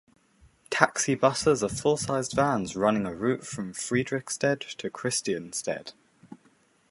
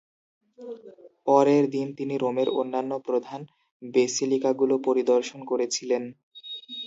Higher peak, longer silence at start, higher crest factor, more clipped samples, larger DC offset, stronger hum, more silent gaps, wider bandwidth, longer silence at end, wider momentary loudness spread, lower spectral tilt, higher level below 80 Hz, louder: first, -2 dBFS vs -6 dBFS; about the same, 0.7 s vs 0.6 s; first, 28 dB vs 20 dB; neither; neither; neither; second, none vs 3.71-3.80 s, 6.23-6.31 s; first, 11.5 kHz vs 8 kHz; first, 0.55 s vs 0 s; second, 10 LU vs 20 LU; about the same, -4 dB/octave vs -4.5 dB/octave; first, -58 dBFS vs -80 dBFS; about the same, -27 LUFS vs -25 LUFS